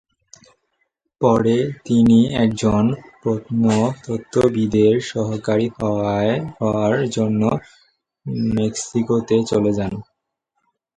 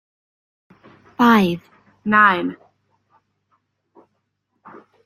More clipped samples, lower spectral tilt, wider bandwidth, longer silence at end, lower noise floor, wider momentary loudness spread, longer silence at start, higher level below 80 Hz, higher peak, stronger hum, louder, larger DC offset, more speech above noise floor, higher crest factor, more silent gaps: neither; about the same, -6.5 dB/octave vs -6 dB/octave; second, 9.4 kHz vs 15.5 kHz; second, 0.95 s vs 2.5 s; about the same, -75 dBFS vs -72 dBFS; second, 8 LU vs 17 LU; about the same, 1.2 s vs 1.2 s; first, -48 dBFS vs -62 dBFS; about the same, -2 dBFS vs -2 dBFS; second, none vs 50 Hz at -50 dBFS; about the same, -19 LUFS vs -17 LUFS; neither; about the same, 57 dB vs 57 dB; about the same, 18 dB vs 20 dB; neither